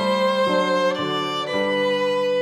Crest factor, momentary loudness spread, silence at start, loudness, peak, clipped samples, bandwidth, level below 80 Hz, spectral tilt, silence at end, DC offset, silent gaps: 12 dB; 4 LU; 0 s; -21 LUFS; -8 dBFS; under 0.1%; 12.5 kHz; -66 dBFS; -4.5 dB/octave; 0 s; under 0.1%; none